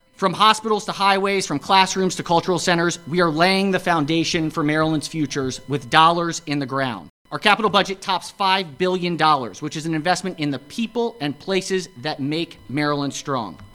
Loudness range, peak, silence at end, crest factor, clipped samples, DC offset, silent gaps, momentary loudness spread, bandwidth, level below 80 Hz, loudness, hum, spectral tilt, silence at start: 5 LU; 0 dBFS; 0.1 s; 20 dB; under 0.1%; under 0.1%; 7.10-7.25 s; 10 LU; 16 kHz; -54 dBFS; -20 LUFS; none; -4 dB/octave; 0.2 s